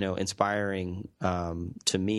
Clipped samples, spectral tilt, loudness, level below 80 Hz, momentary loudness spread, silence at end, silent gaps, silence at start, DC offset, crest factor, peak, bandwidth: under 0.1%; -4.5 dB/octave; -30 LUFS; -54 dBFS; 7 LU; 0 s; none; 0 s; under 0.1%; 22 dB; -8 dBFS; 12.5 kHz